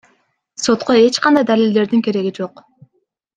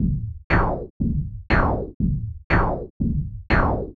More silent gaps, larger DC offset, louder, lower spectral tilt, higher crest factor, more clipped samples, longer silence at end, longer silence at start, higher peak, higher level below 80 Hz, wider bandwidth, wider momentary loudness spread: second, none vs 0.44-0.50 s, 0.90-1.00 s, 1.94-2.00 s, 2.44-2.50 s, 2.90-3.00 s; neither; first, -15 LUFS vs -24 LUFS; second, -4.5 dB/octave vs -9 dB/octave; about the same, 16 dB vs 18 dB; neither; first, 0.9 s vs 0.05 s; first, 0.6 s vs 0 s; about the same, -2 dBFS vs -4 dBFS; second, -60 dBFS vs -28 dBFS; first, 9.4 kHz vs 6.4 kHz; first, 15 LU vs 7 LU